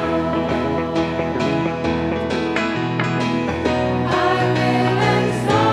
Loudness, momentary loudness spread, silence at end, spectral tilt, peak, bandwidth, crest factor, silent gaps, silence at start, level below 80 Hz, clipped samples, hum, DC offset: -19 LUFS; 4 LU; 0 s; -6.5 dB/octave; -2 dBFS; 12.5 kHz; 18 dB; none; 0 s; -42 dBFS; under 0.1%; none; under 0.1%